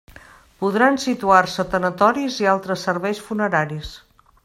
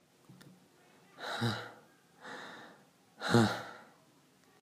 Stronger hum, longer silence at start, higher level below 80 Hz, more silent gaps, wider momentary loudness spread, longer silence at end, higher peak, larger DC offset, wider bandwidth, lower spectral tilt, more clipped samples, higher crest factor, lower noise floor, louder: neither; first, 0.6 s vs 0.3 s; first, -50 dBFS vs -74 dBFS; neither; second, 9 LU vs 27 LU; second, 0.45 s vs 0.8 s; first, 0 dBFS vs -12 dBFS; neither; about the same, 16 kHz vs 15.5 kHz; about the same, -5 dB/octave vs -5.5 dB/octave; neither; second, 20 dB vs 26 dB; second, -46 dBFS vs -66 dBFS; first, -19 LUFS vs -34 LUFS